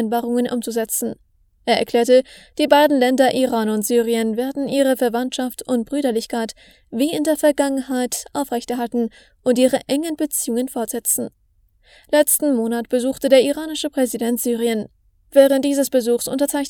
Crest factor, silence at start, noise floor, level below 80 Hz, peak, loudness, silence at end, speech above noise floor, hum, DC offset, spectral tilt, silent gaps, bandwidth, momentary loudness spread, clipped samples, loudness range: 18 dB; 0 s; -57 dBFS; -58 dBFS; 0 dBFS; -19 LUFS; 0 s; 39 dB; none; under 0.1%; -3 dB/octave; none; 20 kHz; 9 LU; under 0.1%; 4 LU